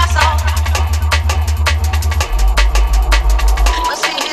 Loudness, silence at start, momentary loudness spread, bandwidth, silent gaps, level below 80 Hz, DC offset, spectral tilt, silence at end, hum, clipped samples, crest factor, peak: -15 LUFS; 0 s; 3 LU; 15.5 kHz; none; -14 dBFS; under 0.1%; -3.5 dB/octave; 0 s; none; under 0.1%; 12 dB; 0 dBFS